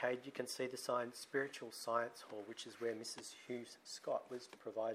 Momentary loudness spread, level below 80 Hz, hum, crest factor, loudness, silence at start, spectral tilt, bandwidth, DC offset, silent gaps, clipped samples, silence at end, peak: 10 LU; under -90 dBFS; none; 20 dB; -44 LUFS; 0 s; -3 dB/octave; 15.5 kHz; under 0.1%; none; under 0.1%; 0 s; -24 dBFS